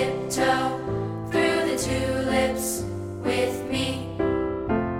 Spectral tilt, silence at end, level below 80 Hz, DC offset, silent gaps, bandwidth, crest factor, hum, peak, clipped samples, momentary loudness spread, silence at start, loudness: -4.5 dB/octave; 0 s; -44 dBFS; under 0.1%; none; 17 kHz; 16 dB; none; -10 dBFS; under 0.1%; 6 LU; 0 s; -25 LUFS